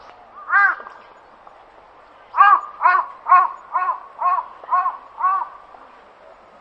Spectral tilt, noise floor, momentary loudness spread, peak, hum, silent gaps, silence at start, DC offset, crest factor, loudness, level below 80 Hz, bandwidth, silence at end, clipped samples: -2.5 dB/octave; -47 dBFS; 14 LU; 0 dBFS; none; none; 0.35 s; under 0.1%; 20 dB; -18 LUFS; -68 dBFS; 5.8 kHz; 1.1 s; under 0.1%